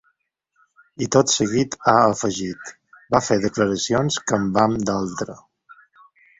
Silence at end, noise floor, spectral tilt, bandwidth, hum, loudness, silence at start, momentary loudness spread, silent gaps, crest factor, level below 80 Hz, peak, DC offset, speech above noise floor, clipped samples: 0.65 s; -71 dBFS; -4.5 dB/octave; 8.4 kHz; none; -20 LUFS; 1 s; 13 LU; none; 20 dB; -52 dBFS; -2 dBFS; under 0.1%; 51 dB; under 0.1%